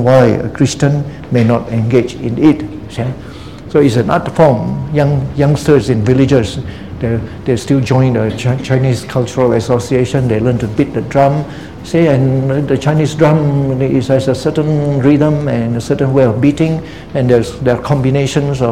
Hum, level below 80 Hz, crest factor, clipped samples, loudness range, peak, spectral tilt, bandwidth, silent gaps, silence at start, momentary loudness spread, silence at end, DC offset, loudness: none; -36 dBFS; 12 dB; 0.2%; 2 LU; 0 dBFS; -7.5 dB/octave; 12.5 kHz; none; 0 s; 8 LU; 0 s; 0.8%; -13 LUFS